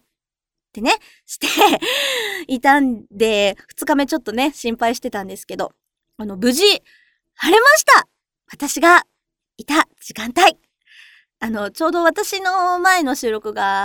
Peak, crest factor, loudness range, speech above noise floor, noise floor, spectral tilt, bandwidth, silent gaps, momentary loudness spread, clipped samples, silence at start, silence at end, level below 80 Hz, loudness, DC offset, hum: 0 dBFS; 18 dB; 6 LU; 69 dB; -86 dBFS; -2 dB/octave; over 20 kHz; none; 15 LU; under 0.1%; 0.75 s; 0 s; -54 dBFS; -16 LUFS; under 0.1%; none